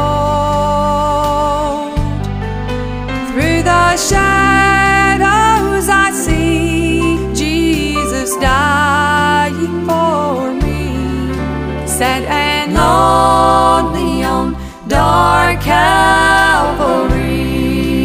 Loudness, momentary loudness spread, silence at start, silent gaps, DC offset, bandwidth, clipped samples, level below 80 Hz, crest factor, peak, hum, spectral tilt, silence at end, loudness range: -12 LUFS; 9 LU; 0 s; none; under 0.1%; 16 kHz; under 0.1%; -24 dBFS; 12 dB; 0 dBFS; none; -4.5 dB/octave; 0 s; 5 LU